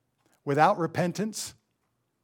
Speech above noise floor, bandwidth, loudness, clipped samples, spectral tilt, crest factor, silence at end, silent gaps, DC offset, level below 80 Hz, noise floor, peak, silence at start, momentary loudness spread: 50 dB; 17.5 kHz; -27 LUFS; under 0.1%; -5 dB/octave; 22 dB; 0.7 s; none; under 0.1%; -72 dBFS; -76 dBFS; -8 dBFS; 0.45 s; 15 LU